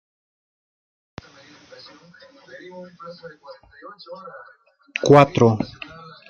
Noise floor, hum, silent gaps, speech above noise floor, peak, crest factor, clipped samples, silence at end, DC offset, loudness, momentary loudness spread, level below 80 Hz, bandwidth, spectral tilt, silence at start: -49 dBFS; none; none; 29 dB; 0 dBFS; 22 dB; under 0.1%; 0.65 s; under 0.1%; -17 LUFS; 29 LU; -58 dBFS; 8 kHz; -6.5 dB/octave; 2.75 s